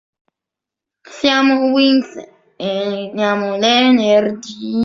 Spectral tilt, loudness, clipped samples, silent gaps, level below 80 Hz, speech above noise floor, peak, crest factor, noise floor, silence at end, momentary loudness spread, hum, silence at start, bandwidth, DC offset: -4.5 dB/octave; -15 LUFS; under 0.1%; none; -60 dBFS; 70 dB; -2 dBFS; 14 dB; -85 dBFS; 0 s; 13 LU; none; 1.1 s; 7.6 kHz; under 0.1%